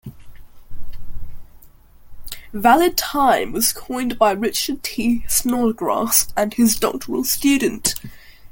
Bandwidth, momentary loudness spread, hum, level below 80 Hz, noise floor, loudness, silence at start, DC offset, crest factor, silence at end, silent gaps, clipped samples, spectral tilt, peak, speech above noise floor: 17 kHz; 8 LU; none; -40 dBFS; -44 dBFS; -18 LUFS; 0.05 s; under 0.1%; 20 dB; 0.05 s; none; under 0.1%; -2.5 dB/octave; 0 dBFS; 26 dB